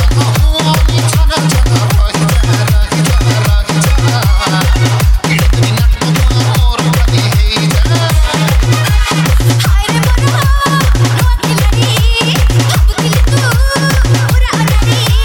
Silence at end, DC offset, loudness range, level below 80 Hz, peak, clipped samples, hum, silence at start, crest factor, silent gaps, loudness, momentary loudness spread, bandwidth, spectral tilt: 0 s; under 0.1%; 0 LU; -12 dBFS; 0 dBFS; under 0.1%; none; 0 s; 8 dB; none; -10 LUFS; 1 LU; 17.5 kHz; -5 dB/octave